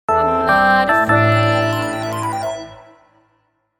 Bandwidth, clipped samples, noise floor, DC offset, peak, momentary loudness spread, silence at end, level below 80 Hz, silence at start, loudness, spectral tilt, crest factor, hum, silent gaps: 19 kHz; under 0.1%; -64 dBFS; under 0.1%; -2 dBFS; 12 LU; 1 s; -46 dBFS; 0.1 s; -15 LUFS; -6 dB/octave; 16 dB; none; none